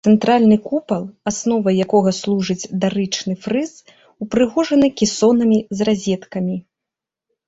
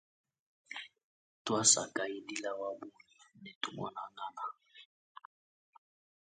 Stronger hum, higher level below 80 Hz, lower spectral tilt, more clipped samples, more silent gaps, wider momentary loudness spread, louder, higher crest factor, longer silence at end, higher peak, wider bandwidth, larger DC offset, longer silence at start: neither; first, -54 dBFS vs -80 dBFS; first, -5.5 dB/octave vs -1.5 dB/octave; neither; second, none vs 1.04-1.45 s, 3.55-3.61 s; second, 10 LU vs 27 LU; first, -18 LUFS vs -34 LUFS; second, 16 dB vs 28 dB; second, 0.85 s vs 1.35 s; first, -2 dBFS vs -12 dBFS; second, 8 kHz vs 9 kHz; neither; second, 0.05 s vs 0.7 s